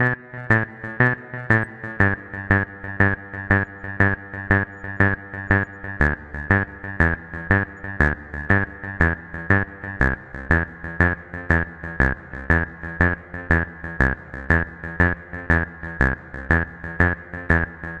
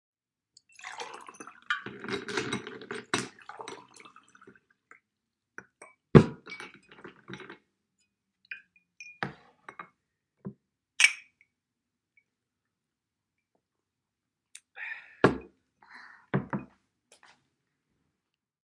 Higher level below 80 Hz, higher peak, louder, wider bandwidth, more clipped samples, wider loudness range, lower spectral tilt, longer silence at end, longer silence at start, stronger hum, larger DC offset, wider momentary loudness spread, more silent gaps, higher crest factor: first, -34 dBFS vs -58 dBFS; about the same, 0 dBFS vs 0 dBFS; first, -22 LUFS vs -29 LUFS; second, 7.8 kHz vs 11.5 kHz; neither; second, 1 LU vs 16 LU; first, -8.5 dB/octave vs -5 dB/octave; second, 0 s vs 2 s; second, 0 s vs 0.85 s; neither; neither; second, 9 LU vs 28 LU; neither; second, 22 dB vs 34 dB